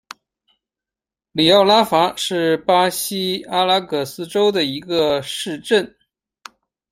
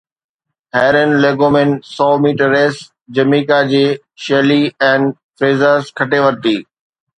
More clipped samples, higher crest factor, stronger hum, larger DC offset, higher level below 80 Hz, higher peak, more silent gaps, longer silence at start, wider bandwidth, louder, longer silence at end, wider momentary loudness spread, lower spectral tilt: neither; about the same, 18 dB vs 14 dB; neither; neither; about the same, -60 dBFS vs -56 dBFS; about the same, 0 dBFS vs 0 dBFS; second, none vs 5.23-5.30 s; first, 1.35 s vs 0.75 s; first, 16 kHz vs 9.6 kHz; second, -17 LUFS vs -13 LUFS; first, 1.05 s vs 0.55 s; first, 11 LU vs 6 LU; second, -3.5 dB/octave vs -6.5 dB/octave